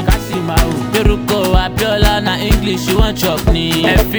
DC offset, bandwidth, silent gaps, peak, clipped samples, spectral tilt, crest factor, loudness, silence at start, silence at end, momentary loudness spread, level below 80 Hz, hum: under 0.1%; over 20 kHz; none; 0 dBFS; under 0.1%; -5 dB/octave; 12 dB; -14 LUFS; 0 s; 0 s; 3 LU; -18 dBFS; none